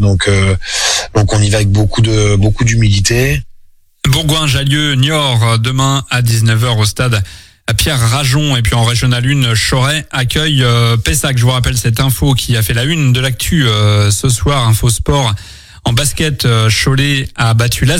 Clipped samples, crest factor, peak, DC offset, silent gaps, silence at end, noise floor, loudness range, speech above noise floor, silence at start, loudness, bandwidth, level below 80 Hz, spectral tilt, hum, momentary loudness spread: under 0.1%; 10 dB; 0 dBFS; under 0.1%; none; 0 s; -41 dBFS; 1 LU; 30 dB; 0 s; -11 LUFS; 16.5 kHz; -26 dBFS; -4.5 dB/octave; none; 3 LU